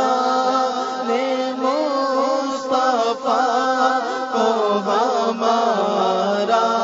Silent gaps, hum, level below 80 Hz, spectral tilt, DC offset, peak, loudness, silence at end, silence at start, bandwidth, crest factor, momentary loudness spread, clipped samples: none; none; -72 dBFS; -4 dB/octave; under 0.1%; -4 dBFS; -19 LUFS; 0 s; 0 s; 7.8 kHz; 14 dB; 4 LU; under 0.1%